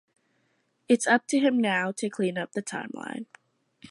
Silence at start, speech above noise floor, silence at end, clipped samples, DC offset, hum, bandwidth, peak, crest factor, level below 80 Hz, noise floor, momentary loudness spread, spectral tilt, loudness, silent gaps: 0.9 s; 46 dB; 0.05 s; under 0.1%; under 0.1%; none; 11.5 kHz; -8 dBFS; 20 dB; -80 dBFS; -72 dBFS; 15 LU; -4 dB/octave; -26 LUFS; none